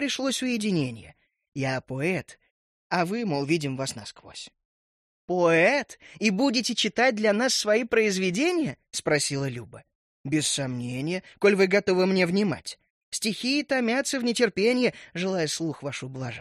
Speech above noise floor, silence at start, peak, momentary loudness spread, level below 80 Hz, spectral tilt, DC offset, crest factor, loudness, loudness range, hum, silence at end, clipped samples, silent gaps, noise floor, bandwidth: over 65 dB; 0 s; -8 dBFS; 13 LU; -66 dBFS; -4 dB/octave; under 0.1%; 18 dB; -25 LUFS; 6 LU; none; 0 s; under 0.1%; 1.48-1.52 s, 2.51-2.90 s, 4.65-5.28 s, 9.95-10.24 s, 12.90-13.12 s; under -90 dBFS; 13 kHz